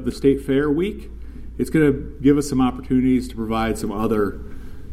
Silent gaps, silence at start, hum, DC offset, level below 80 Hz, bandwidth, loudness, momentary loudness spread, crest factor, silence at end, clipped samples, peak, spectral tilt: none; 0 s; none; under 0.1%; -34 dBFS; 14.5 kHz; -20 LUFS; 19 LU; 16 dB; 0 s; under 0.1%; -4 dBFS; -7 dB/octave